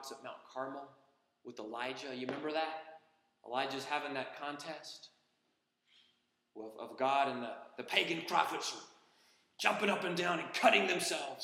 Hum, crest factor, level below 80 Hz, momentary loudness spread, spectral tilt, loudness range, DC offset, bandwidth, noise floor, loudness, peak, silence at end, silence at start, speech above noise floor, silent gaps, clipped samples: none; 26 dB; under -90 dBFS; 19 LU; -3 dB/octave; 9 LU; under 0.1%; 16.5 kHz; -81 dBFS; -35 LUFS; -12 dBFS; 0 s; 0 s; 44 dB; none; under 0.1%